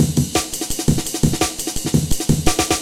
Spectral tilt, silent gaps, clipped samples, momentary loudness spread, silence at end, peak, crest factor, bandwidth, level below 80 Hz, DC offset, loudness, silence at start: -4 dB/octave; none; under 0.1%; 3 LU; 0 s; 0 dBFS; 18 dB; 17 kHz; -30 dBFS; under 0.1%; -19 LUFS; 0 s